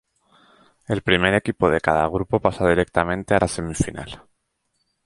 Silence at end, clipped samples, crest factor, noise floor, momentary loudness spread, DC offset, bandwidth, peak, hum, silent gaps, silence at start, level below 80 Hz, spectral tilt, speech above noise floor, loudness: 0.9 s; under 0.1%; 22 dB; -72 dBFS; 9 LU; under 0.1%; 11.5 kHz; 0 dBFS; none; none; 0.9 s; -42 dBFS; -5.5 dB/octave; 52 dB; -21 LUFS